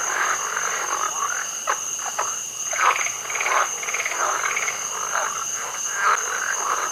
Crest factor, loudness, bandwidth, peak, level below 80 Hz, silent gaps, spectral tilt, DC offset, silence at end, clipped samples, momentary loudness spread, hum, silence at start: 20 dB; -22 LUFS; 16 kHz; -4 dBFS; -70 dBFS; none; 1.5 dB/octave; under 0.1%; 0 s; under 0.1%; 5 LU; none; 0 s